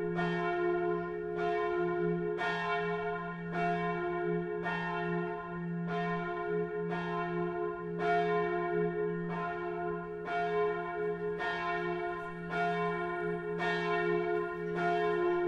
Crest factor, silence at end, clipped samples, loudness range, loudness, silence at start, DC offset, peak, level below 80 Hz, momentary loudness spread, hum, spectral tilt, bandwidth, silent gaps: 14 dB; 0 s; under 0.1%; 2 LU; -34 LUFS; 0 s; under 0.1%; -20 dBFS; -62 dBFS; 6 LU; none; -7.5 dB/octave; 7.8 kHz; none